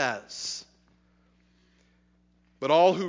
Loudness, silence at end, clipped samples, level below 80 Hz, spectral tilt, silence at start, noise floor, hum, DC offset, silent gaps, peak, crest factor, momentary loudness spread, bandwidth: -27 LUFS; 0 s; under 0.1%; -70 dBFS; -4 dB/octave; 0 s; -65 dBFS; 60 Hz at -65 dBFS; under 0.1%; none; -10 dBFS; 20 dB; 14 LU; 7.6 kHz